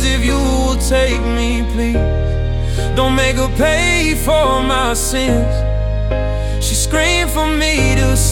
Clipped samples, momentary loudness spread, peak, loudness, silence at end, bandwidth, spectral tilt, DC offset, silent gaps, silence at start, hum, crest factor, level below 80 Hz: under 0.1%; 5 LU; -2 dBFS; -15 LUFS; 0 s; 18 kHz; -4.5 dB/octave; under 0.1%; none; 0 s; none; 12 dB; -18 dBFS